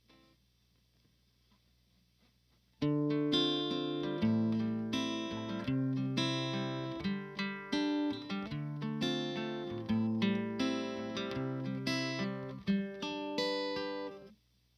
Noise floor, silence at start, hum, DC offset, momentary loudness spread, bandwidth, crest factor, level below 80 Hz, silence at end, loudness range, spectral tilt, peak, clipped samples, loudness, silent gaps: -72 dBFS; 2.8 s; none; under 0.1%; 7 LU; 13 kHz; 18 dB; -66 dBFS; 0.45 s; 3 LU; -6 dB/octave; -18 dBFS; under 0.1%; -35 LUFS; none